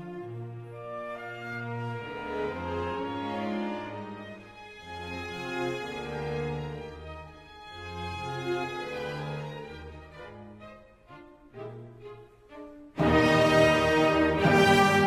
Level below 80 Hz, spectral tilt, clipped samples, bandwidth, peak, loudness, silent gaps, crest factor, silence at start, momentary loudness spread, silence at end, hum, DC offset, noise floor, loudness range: -50 dBFS; -5.5 dB/octave; under 0.1%; 16 kHz; -10 dBFS; -28 LUFS; none; 20 dB; 0 s; 24 LU; 0 s; none; under 0.1%; -51 dBFS; 15 LU